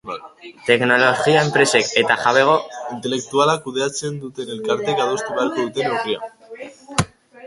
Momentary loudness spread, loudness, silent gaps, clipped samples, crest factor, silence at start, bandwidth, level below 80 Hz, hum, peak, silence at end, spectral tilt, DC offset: 15 LU; -18 LUFS; none; under 0.1%; 20 dB; 0.05 s; 11.5 kHz; -54 dBFS; none; 0 dBFS; 0 s; -3.5 dB/octave; under 0.1%